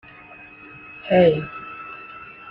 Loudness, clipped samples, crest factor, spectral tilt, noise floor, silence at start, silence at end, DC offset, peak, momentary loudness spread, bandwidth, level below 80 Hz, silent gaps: -19 LUFS; under 0.1%; 20 dB; -9.5 dB/octave; -44 dBFS; 0.95 s; 0 s; under 0.1%; -4 dBFS; 25 LU; 5.4 kHz; -56 dBFS; none